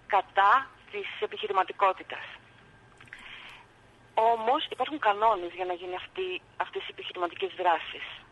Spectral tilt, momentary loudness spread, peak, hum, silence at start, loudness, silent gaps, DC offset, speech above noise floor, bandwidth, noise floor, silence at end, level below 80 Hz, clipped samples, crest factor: -4 dB/octave; 20 LU; -10 dBFS; none; 0.1 s; -29 LUFS; none; under 0.1%; 29 dB; 11.5 kHz; -57 dBFS; 0.1 s; -66 dBFS; under 0.1%; 20 dB